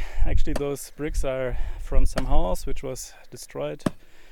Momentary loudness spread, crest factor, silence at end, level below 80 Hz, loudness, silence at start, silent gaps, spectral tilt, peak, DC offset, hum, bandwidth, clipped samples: 9 LU; 16 dB; 0.05 s; -24 dBFS; -30 LUFS; 0 s; none; -5.5 dB/octave; -4 dBFS; under 0.1%; none; 12.5 kHz; under 0.1%